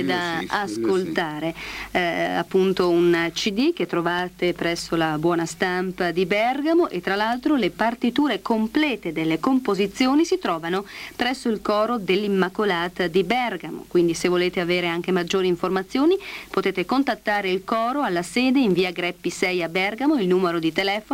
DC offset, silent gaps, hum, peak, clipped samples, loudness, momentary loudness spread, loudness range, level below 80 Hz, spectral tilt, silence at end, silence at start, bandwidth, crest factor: under 0.1%; none; none; -6 dBFS; under 0.1%; -22 LUFS; 5 LU; 1 LU; -54 dBFS; -5 dB/octave; 0 s; 0 s; 16.5 kHz; 16 dB